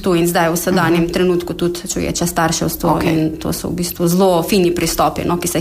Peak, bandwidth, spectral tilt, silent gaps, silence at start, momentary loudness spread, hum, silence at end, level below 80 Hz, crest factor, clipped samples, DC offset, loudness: -2 dBFS; 15.5 kHz; -5 dB/octave; none; 0 s; 6 LU; none; 0 s; -36 dBFS; 12 dB; under 0.1%; under 0.1%; -16 LUFS